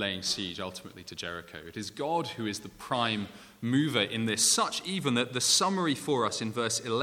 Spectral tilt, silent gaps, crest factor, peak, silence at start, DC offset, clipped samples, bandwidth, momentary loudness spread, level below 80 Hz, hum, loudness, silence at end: -3 dB/octave; none; 20 dB; -10 dBFS; 0 s; under 0.1%; under 0.1%; 18.5 kHz; 16 LU; -68 dBFS; none; -29 LUFS; 0 s